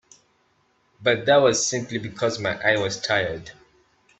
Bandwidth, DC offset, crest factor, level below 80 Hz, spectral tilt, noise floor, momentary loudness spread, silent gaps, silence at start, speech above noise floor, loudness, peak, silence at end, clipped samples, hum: 8.4 kHz; under 0.1%; 20 dB; -60 dBFS; -3 dB/octave; -65 dBFS; 11 LU; none; 1 s; 43 dB; -22 LUFS; -4 dBFS; 0.7 s; under 0.1%; none